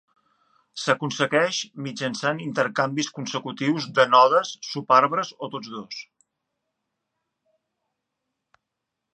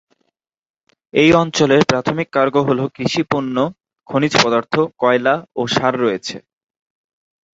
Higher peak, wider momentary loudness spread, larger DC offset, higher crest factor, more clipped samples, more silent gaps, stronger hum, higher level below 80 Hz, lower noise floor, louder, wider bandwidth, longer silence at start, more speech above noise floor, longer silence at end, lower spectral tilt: about the same, -2 dBFS vs 0 dBFS; first, 17 LU vs 8 LU; neither; first, 24 dB vs 18 dB; neither; neither; neither; second, -78 dBFS vs -52 dBFS; first, -83 dBFS vs -70 dBFS; second, -22 LUFS vs -16 LUFS; first, 9.4 kHz vs 8 kHz; second, 0.75 s vs 1.15 s; first, 60 dB vs 55 dB; first, 3.1 s vs 1.15 s; about the same, -4 dB/octave vs -5 dB/octave